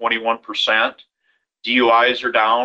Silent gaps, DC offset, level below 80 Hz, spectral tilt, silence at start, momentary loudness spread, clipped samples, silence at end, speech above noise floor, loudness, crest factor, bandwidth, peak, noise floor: none; under 0.1%; -62 dBFS; -3 dB/octave; 0 s; 8 LU; under 0.1%; 0 s; 50 dB; -17 LUFS; 16 dB; 8.2 kHz; -2 dBFS; -68 dBFS